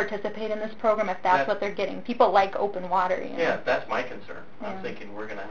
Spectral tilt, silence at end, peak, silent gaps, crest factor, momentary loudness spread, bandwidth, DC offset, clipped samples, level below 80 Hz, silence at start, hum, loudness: -5.5 dB/octave; 0 s; -6 dBFS; none; 20 dB; 15 LU; 7.4 kHz; 1%; under 0.1%; -62 dBFS; 0 s; none; -26 LUFS